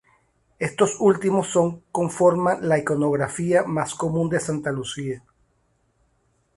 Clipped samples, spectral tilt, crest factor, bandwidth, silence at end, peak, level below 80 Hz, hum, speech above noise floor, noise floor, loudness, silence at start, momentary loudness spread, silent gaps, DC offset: under 0.1%; -5.5 dB/octave; 20 dB; 11.5 kHz; 1.4 s; -4 dBFS; -58 dBFS; none; 45 dB; -67 dBFS; -22 LUFS; 0.6 s; 10 LU; none; under 0.1%